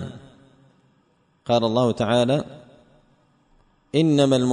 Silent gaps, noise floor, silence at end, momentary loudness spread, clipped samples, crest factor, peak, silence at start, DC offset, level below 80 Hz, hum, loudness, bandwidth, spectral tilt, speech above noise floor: none; -63 dBFS; 0 s; 19 LU; under 0.1%; 18 dB; -6 dBFS; 0 s; under 0.1%; -58 dBFS; none; -21 LUFS; 10 kHz; -6.5 dB/octave; 44 dB